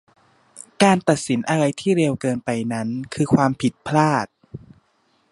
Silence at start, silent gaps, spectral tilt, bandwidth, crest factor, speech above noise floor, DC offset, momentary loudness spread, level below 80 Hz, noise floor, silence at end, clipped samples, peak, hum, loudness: 0.55 s; none; -5.5 dB/octave; 11.5 kHz; 20 dB; 44 dB; under 0.1%; 10 LU; -58 dBFS; -64 dBFS; 0.75 s; under 0.1%; 0 dBFS; none; -20 LUFS